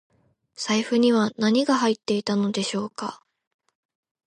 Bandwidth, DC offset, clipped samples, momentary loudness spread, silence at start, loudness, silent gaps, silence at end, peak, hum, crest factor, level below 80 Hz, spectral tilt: 11.5 kHz; under 0.1%; under 0.1%; 12 LU; 0.6 s; -23 LUFS; none; 1.15 s; -10 dBFS; none; 16 dB; -72 dBFS; -4.5 dB/octave